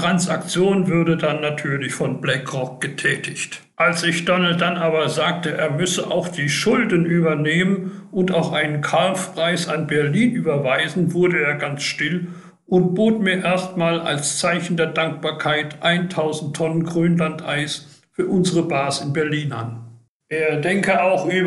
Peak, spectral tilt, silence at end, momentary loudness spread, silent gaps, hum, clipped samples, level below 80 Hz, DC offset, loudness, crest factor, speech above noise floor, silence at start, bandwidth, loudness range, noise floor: -6 dBFS; -5 dB/octave; 0 s; 6 LU; 20.08-20.20 s; none; under 0.1%; -60 dBFS; under 0.1%; -20 LUFS; 14 dB; 24 dB; 0 s; 12 kHz; 2 LU; -44 dBFS